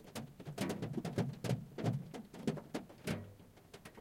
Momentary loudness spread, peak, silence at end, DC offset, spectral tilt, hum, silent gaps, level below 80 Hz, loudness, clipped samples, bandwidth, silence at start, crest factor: 16 LU; -22 dBFS; 0 s; under 0.1%; -6.5 dB/octave; none; none; -68 dBFS; -42 LUFS; under 0.1%; 16.5 kHz; 0 s; 20 dB